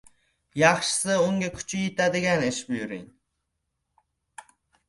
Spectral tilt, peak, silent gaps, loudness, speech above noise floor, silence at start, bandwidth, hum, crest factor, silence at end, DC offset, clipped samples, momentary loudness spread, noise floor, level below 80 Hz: -4 dB/octave; -4 dBFS; none; -24 LUFS; 55 dB; 0.55 s; 11.5 kHz; none; 24 dB; 0.5 s; under 0.1%; under 0.1%; 12 LU; -79 dBFS; -60 dBFS